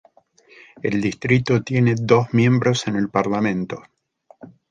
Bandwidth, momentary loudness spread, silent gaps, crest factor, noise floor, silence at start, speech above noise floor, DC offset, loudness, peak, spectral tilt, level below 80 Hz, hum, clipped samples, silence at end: 9 kHz; 10 LU; none; 20 dB; -54 dBFS; 0.85 s; 35 dB; under 0.1%; -19 LUFS; -2 dBFS; -6.5 dB/octave; -54 dBFS; none; under 0.1%; 0.25 s